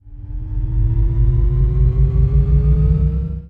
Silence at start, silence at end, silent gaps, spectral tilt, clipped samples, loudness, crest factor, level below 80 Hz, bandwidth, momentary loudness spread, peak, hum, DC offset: 0.05 s; 0 s; none; -12 dB/octave; under 0.1%; -17 LUFS; 12 dB; -16 dBFS; 2.3 kHz; 10 LU; -4 dBFS; none; under 0.1%